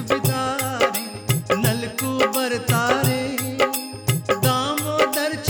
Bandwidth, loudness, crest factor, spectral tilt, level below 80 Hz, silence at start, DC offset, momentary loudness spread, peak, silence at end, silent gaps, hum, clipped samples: over 20 kHz; -21 LUFS; 18 dB; -4.5 dB/octave; -50 dBFS; 0 s; under 0.1%; 5 LU; -4 dBFS; 0 s; none; none; under 0.1%